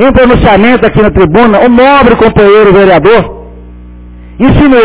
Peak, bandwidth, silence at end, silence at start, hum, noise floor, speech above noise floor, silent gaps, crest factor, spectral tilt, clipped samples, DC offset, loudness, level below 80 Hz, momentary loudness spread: 0 dBFS; 4 kHz; 0 s; 0 s; 60 Hz at -30 dBFS; -27 dBFS; 24 dB; none; 4 dB; -10.5 dB/octave; 10%; under 0.1%; -4 LUFS; -20 dBFS; 4 LU